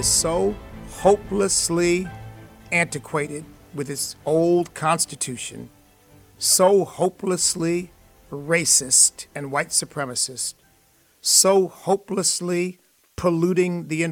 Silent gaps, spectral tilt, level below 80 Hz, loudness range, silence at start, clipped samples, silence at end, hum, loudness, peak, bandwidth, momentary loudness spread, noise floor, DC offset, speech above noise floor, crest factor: none; -3 dB/octave; -48 dBFS; 5 LU; 0 s; under 0.1%; 0 s; none; -20 LUFS; -4 dBFS; 18 kHz; 18 LU; -59 dBFS; under 0.1%; 38 dB; 20 dB